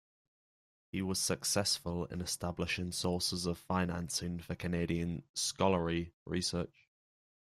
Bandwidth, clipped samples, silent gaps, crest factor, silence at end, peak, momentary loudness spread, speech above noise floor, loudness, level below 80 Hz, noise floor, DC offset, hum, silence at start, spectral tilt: 15.5 kHz; under 0.1%; 5.29-5.34 s, 6.14-6.26 s; 20 dB; 0.9 s; -16 dBFS; 8 LU; over 54 dB; -35 LUFS; -60 dBFS; under -90 dBFS; under 0.1%; none; 0.95 s; -4 dB/octave